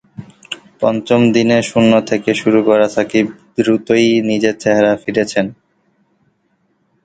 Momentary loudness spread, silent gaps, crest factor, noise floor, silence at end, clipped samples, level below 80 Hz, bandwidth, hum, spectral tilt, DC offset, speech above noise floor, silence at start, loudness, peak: 8 LU; none; 14 dB; -62 dBFS; 1.5 s; under 0.1%; -54 dBFS; 9.2 kHz; none; -5.5 dB/octave; under 0.1%; 49 dB; 0.2 s; -14 LUFS; 0 dBFS